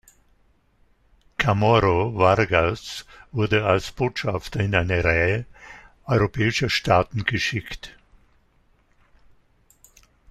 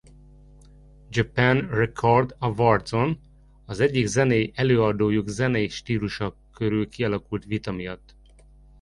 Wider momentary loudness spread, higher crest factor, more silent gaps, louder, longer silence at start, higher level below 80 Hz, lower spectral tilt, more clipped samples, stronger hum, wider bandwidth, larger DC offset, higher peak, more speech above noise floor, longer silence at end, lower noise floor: first, 17 LU vs 11 LU; about the same, 22 dB vs 20 dB; neither; about the same, -22 LUFS vs -24 LUFS; first, 1.4 s vs 1.1 s; about the same, -44 dBFS vs -48 dBFS; about the same, -5.5 dB/octave vs -6.5 dB/octave; neither; neither; first, 13.5 kHz vs 11.5 kHz; neither; about the same, -2 dBFS vs -4 dBFS; first, 40 dB vs 28 dB; first, 2.4 s vs 0.85 s; first, -61 dBFS vs -51 dBFS